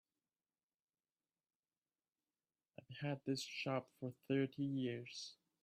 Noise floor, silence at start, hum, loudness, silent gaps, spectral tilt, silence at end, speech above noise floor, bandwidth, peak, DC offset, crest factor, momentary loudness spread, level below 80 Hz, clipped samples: under -90 dBFS; 2.9 s; none; -44 LUFS; none; -5.5 dB/octave; 0.3 s; over 47 dB; 13.5 kHz; -26 dBFS; under 0.1%; 20 dB; 14 LU; -88 dBFS; under 0.1%